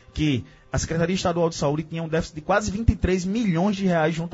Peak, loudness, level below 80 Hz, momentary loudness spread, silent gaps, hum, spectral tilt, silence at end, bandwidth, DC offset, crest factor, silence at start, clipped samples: -4 dBFS; -24 LUFS; -36 dBFS; 6 LU; none; none; -6 dB/octave; 0 s; 8 kHz; under 0.1%; 20 dB; 0.15 s; under 0.1%